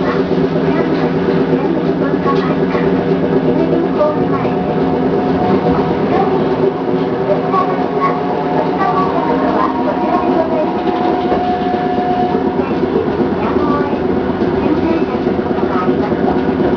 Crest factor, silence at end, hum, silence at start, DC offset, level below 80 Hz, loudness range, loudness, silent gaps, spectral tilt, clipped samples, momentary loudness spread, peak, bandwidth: 14 dB; 0 s; none; 0 s; under 0.1%; -40 dBFS; 1 LU; -15 LUFS; none; -9 dB/octave; under 0.1%; 2 LU; 0 dBFS; 5.4 kHz